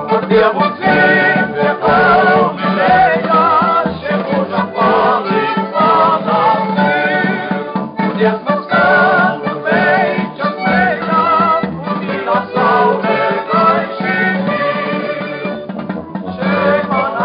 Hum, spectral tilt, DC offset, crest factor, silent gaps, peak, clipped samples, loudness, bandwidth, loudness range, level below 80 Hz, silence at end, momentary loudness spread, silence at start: none; -4 dB/octave; under 0.1%; 12 dB; none; -2 dBFS; under 0.1%; -13 LUFS; 5.2 kHz; 4 LU; -50 dBFS; 0 s; 9 LU; 0 s